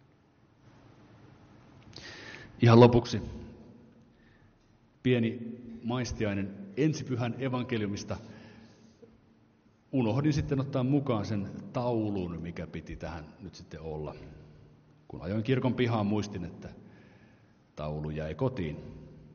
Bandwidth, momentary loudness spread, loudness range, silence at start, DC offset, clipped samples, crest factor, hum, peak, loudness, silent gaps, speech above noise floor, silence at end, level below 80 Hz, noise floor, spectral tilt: 6.8 kHz; 19 LU; 9 LU; 1.25 s; under 0.1%; under 0.1%; 26 dB; none; -6 dBFS; -30 LUFS; none; 34 dB; 0 s; -54 dBFS; -64 dBFS; -7 dB/octave